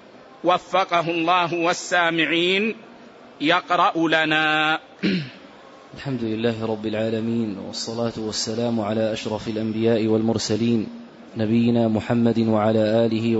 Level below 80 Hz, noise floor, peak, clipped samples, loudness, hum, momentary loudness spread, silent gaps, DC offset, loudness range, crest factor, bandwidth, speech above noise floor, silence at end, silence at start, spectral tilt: -60 dBFS; -45 dBFS; -4 dBFS; under 0.1%; -21 LUFS; none; 9 LU; none; under 0.1%; 5 LU; 18 dB; 8 kHz; 24 dB; 0 s; 0.15 s; -5 dB/octave